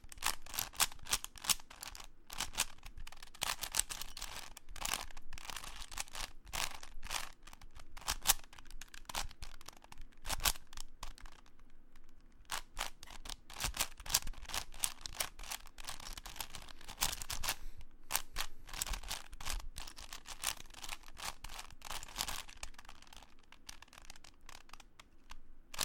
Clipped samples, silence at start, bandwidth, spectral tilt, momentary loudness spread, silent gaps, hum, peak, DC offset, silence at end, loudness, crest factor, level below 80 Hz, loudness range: under 0.1%; 0 s; 17 kHz; 0 dB/octave; 21 LU; none; none; -6 dBFS; under 0.1%; 0 s; -40 LUFS; 36 dB; -50 dBFS; 7 LU